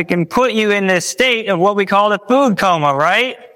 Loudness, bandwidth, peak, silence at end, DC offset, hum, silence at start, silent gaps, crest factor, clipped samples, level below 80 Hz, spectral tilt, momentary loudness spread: -14 LUFS; 17 kHz; -2 dBFS; 0.1 s; under 0.1%; none; 0 s; none; 12 dB; under 0.1%; -52 dBFS; -4 dB/octave; 2 LU